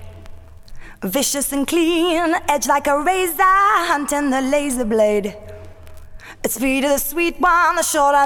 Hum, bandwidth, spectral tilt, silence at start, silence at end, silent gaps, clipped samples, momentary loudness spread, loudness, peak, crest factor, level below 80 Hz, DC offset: none; 19 kHz; -2.5 dB/octave; 0 s; 0 s; none; under 0.1%; 8 LU; -17 LUFS; -4 dBFS; 14 dB; -40 dBFS; under 0.1%